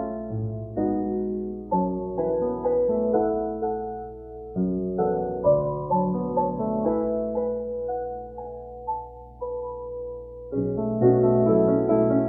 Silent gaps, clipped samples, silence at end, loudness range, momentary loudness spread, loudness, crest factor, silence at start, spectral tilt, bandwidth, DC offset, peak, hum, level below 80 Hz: none; under 0.1%; 0 s; 7 LU; 15 LU; -25 LUFS; 18 dB; 0 s; -14.5 dB/octave; 2.5 kHz; under 0.1%; -6 dBFS; 60 Hz at -45 dBFS; -48 dBFS